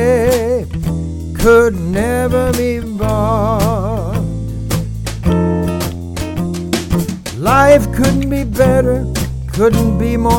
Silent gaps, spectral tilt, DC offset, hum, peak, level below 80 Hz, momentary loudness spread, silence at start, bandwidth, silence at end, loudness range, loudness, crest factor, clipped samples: none; -6.5 dB/octave; 0.1%; none; 0 dBFS; -24 dBFS; 10 LU; 0 s; 17 kHz; 0 s; 5 LU; -15 LUFS; 14 dB; under 0.1%